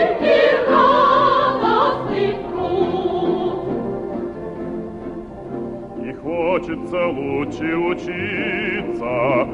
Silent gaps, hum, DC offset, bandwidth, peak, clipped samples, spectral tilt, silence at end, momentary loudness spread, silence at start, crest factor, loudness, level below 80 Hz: none; none; under 0.1%; 8 kHz; -4 dBFS; under 0.1%; -7 dB/octave; 0 s; 15 LU; 0 s; 16 dB; -19 LUFS; -46 dBFS